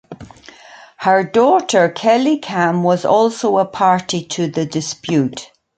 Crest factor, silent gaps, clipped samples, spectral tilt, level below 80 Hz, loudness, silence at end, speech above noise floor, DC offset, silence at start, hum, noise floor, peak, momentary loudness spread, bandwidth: 16 dB; none; under 0.1%; -5 dB/octave; -58 dBFS; -16 LUFS; 0.3 s; 26 dB; under 0.1%; 0.1 s; none; -41 dBFS; 0 dBFS; 8 LU; 9.4 kHz